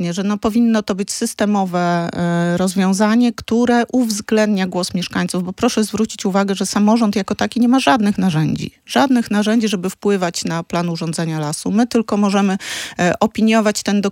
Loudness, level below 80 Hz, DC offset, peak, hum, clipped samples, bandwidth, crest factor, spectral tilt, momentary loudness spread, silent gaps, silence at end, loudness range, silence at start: -17 LUFS; -52 dBFS; under 0.1%; 0 dBFS; none; under 0.1%; 16.5 kHz; 16 dB; -5 dB/octave; 7 LU; none; 0 s; 2 LU; 0 s